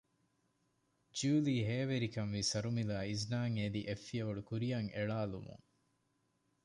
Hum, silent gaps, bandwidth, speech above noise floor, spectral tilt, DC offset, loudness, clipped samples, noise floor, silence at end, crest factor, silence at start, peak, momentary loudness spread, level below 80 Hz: none; none; 11 kHz; 42 dB; -5.5 dB/octave; under 0.1%; -38 LUFS; under 0.1%; -80 dBFS; 1.1 s; 16 dB; 1.15 s; -24 dBFS; 8 LU; -66 dBFS